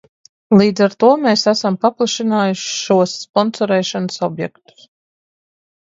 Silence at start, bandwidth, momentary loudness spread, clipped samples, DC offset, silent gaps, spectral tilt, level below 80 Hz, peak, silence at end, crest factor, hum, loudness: 0.5 s; 7.8 kHz; 9 LU; under 0.1%; under 0.1%; 3.29-3.34 s; -5 dB/octave; -62 dBFS; 0 dBFS; 1.45 s; 16 dB; none; -15 LUFS